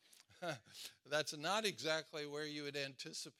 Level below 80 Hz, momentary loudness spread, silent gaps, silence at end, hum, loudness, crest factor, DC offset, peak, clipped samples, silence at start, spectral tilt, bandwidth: under -90 dBFS; 11 LU; none; 0.1 s; none; -42 LUFS; 22 dB; under 0.1%; -22 dBFS; under 0.1%; 0.1 s; -2.5 dB/octave; 16 kHz